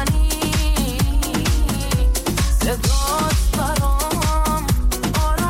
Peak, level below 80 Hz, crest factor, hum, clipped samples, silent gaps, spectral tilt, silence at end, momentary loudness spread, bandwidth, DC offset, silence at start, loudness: -8 dBFS; -20 dBFS; 10 dB; none; under 0.1%; none; -4.5 dB/octave; 0 s; 2 LU; 16.5 kHz; 0.1%; 0 s; -20 LUFS